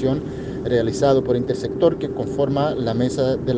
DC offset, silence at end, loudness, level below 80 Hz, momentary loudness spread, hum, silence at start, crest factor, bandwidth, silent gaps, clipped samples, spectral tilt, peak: under 0.1%; 0 s; -21 LUFS; -44 dBFS; 7 LU; none; 0 s; 16 dB; 9.4 kHz; none; under 0.1%; -7 dB/octave; -4 dBFS